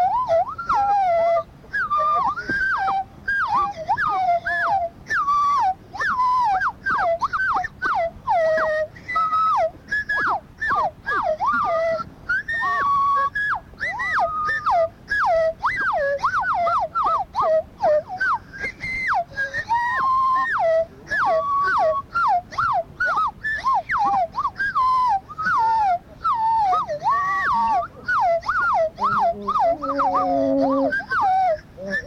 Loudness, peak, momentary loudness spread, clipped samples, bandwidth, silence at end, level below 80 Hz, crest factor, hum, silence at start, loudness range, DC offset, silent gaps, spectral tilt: -21 LUFS; -8 dBFS; 5 LU; under 0.1%; 11.5 kHz; 0 s; -50 dBFS; 14 dB; none; 0 s; 1 LU; under 0.1%; none; -5 dB/octave